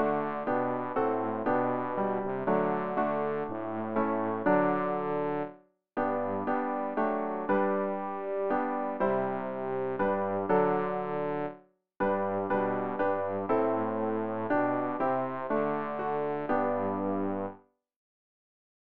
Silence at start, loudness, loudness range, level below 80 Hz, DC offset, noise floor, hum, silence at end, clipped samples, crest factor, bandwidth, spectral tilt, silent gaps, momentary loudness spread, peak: 0 s; -30 LUFS; 1 LU; -66 dBFS; 0.4%; -52 dBFS; none; 1 s; under 0.1%; 16 dB; 4.8 kHz; -6.5 dB/octave; none; 5 LU; -14 dBFS